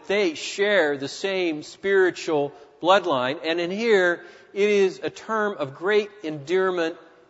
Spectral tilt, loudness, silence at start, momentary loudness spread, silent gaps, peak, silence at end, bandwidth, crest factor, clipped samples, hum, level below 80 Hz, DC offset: -4 dB/octave; -23 LUFS; 0.1 s; 10 LU; none; -4 dBFS; 0.3 s; 8 kHz; 20 dB; under 0.1%; none; -74 dBFS; under 0.1%